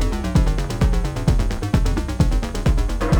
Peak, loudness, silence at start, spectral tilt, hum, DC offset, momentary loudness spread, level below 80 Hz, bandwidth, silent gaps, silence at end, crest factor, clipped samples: -4 dBFS; -21 LUFS; 0 s; -6.5 dB/octave; none; under 0.1%; 2 LU; -20 dBFS; 17.5 kHz; none; 0 s; 14 dB; under 0.1%